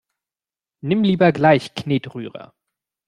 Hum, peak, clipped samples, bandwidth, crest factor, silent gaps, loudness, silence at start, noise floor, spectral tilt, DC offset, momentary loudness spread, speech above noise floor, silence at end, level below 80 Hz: none; -2 dBFS; under 0.1%; 11 kHz; 18 dB; none; -18 LUFS; 0.85 s; under -90 dBFS; -7.5 dB/octave; under 0.1%; 18 LU; over 72 dB; 0.65 s; -60 dBFS